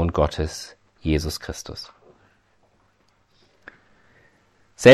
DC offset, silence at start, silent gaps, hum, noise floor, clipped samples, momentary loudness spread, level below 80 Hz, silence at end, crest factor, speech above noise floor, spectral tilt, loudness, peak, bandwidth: under 0.1%; 0 s; none; none; -63 dBFS; under 0.1%; 25 LU; -38 dBFS; 0 s; 22 dB; 37 dB; -5.5 dB/octave; -25 LUFS; 0 dBFS; 14.5 kHz